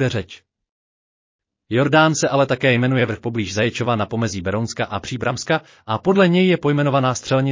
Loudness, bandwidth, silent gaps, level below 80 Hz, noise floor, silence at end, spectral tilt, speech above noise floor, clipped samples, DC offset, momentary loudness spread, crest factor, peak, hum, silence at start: -19 LUFS; 7.6 kHz; 0.71-1.39 s; -48 dBFS; under -90 dBFS; 0 s; -5.5 dB/octave; over 72 dB; under 0.1%; under 0.1%; 9 LU; 16 dB; -2 dBFS; none; 0 s